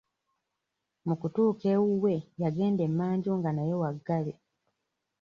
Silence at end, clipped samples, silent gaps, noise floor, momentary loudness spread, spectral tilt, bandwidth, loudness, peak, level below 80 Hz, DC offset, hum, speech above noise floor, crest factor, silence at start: 0.9 s; under 0.1%; none; -84 dBFS; 7 LU; -10 dB/octave; 6.8 kHz; -29 LUFS; -16 dBFS; -70 dBFS; under 0.1%; none; 56 dB; 14 dB; 1.05 s